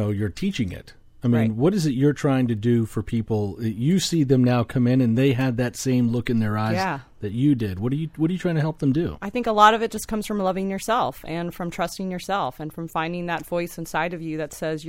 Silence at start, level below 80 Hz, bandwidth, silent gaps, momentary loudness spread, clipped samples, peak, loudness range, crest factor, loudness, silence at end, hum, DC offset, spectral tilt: 0 s; -48 dBFS; 16 kHz; none; 9 LU; under 0.1%; -2 dBFS; 6 LU; 22 dB; -23 LUFS; 0 s; none; under 0.1%; -6.5 dB/octave